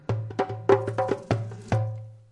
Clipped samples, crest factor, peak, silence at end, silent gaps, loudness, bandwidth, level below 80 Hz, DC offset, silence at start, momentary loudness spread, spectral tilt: under 0.1%; 22 dB; -6 dBFS; 0.1 s; none; -27 LUFS; 10.5 kHz; -56 dBFS; under 0.1%; 0.1 s; 8 LU; -8 dB/octave